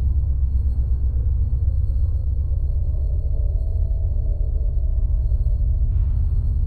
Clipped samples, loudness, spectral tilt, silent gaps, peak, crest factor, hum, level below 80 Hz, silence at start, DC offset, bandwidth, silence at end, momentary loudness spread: under 0.1%; -23 LUFS; -11.5 dB/octave; none; -10 dBFS; 10 dB; none; -20 dBFS; 0 s; under 0.1%; 1.1 kHz; 0 s; 2 LU